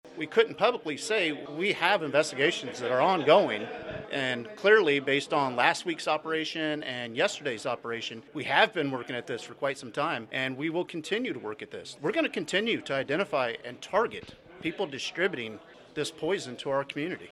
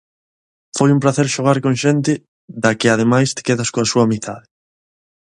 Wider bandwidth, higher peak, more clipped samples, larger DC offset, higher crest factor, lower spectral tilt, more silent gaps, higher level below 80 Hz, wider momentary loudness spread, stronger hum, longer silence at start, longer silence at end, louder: first, 12.5 kHz vs 11 kHz; second, -6 dBFS vs 0 dBFS; neither; neither; about the same, 22 dB vs 18 dB; about the same, -4 dB/octave vs -5 dB/octave; second, none vs 2.28-2.48 s; second, -70 dBFS vs -56 dBFS; about the same, 12 LU vs 11 LU; neither; second, 0.05 s vs 0.75 s; second, 0 s vs 0.95 s; second, -28 LUFS vs -16 LUFS